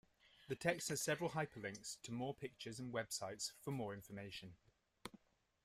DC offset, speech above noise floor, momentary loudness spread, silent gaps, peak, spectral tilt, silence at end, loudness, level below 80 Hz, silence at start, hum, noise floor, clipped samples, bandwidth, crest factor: under 0.1%; 24 dB; 15 LU; none; -22 dBFS; -3.5 dB/octave; 0.5 s; -45 LUFS; -76 dBFS; 0.4 s; none; -69 dBFS; under 0.1%; 15.5 kHz; 24 dB